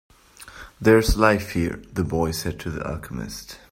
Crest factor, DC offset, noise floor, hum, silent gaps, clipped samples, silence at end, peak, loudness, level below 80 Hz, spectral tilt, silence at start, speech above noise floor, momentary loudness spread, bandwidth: 20 dB; under 0.1%; -45 dBFS; none; none; under 0.1%; 0.15 s; -2 dBFS; -23 LUFS; -34 dBFS; -5.5 dB/octave; 0.4 s; 23 dB; 19 LU; 16 kHz